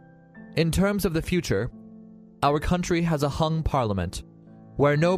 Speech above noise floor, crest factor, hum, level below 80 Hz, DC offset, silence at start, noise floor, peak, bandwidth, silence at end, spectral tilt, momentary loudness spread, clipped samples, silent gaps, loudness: 24 dB; 16 dB; none; -40 dBFS; under 0.1%; 0.35 s; -48 dBFS; -8 dBFS; 15.5 kHz; 0 s; -6 dB/octave; 11 LU; under 0.1%; none; -25 LUFS